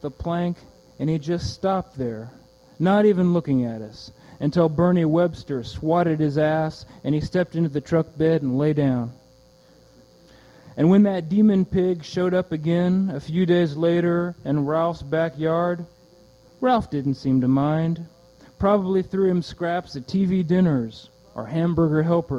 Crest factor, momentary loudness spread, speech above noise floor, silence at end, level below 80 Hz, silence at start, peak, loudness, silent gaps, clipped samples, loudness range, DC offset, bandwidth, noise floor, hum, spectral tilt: 16 dB; 12 LU; 32 dB; 0 s; -50 dBFS; 0.05 s; -6 dBFS; -22 LUFS; none; under 0.1%; 3 LU; under 0.1%; 7.8 kHz; -53 dBFS; none; -8.5 dB/octave